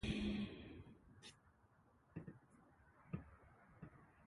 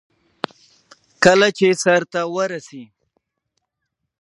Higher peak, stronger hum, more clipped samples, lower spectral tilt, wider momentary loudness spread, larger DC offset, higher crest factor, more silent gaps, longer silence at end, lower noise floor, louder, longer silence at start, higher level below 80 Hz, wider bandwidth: second, -30 dBFS vs 0 dBFS; neither; neither; first, -6 dB/octave vs -4 dB/octave; first, 23 LU vs 18 LU; neither; about the same, 20 dB vs 20 dB; neither; second, 0 s vs 1.35 s; second, -73 dBFS vs -78 dBFS; second, -51 LUFS vs -16 LUFS; second, 0 s vs 1.2 s; about the same, -62 dBFS vs -64 dBFS; about the same, 11.5 kHz vs 11.5 kHz